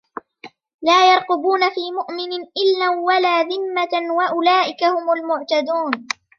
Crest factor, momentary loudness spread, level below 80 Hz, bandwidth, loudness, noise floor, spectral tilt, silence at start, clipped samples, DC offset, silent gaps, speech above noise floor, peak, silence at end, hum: 18 dB; 11 LU; -76 dBFS; 7.4 kHz; -18 LUFS; -44 dBFS; -2 dB/octave; 0.45 s; under 0.1%; under 0.1%; 0.74-0.79 s; 26 dB; -2 dBFS; 0.35 s; none